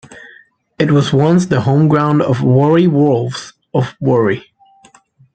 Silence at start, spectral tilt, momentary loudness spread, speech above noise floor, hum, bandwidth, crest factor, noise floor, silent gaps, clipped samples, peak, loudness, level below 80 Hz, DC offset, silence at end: 0.1 s; -7.5 dB/octave; 8 LU; 36 dB; none; 9 kHz; 12 dB; -48 dBFS; none; under 0.1%; -2 dBFS; -13 LUFS; -52 dBFS; under 0.1%; 0.95 s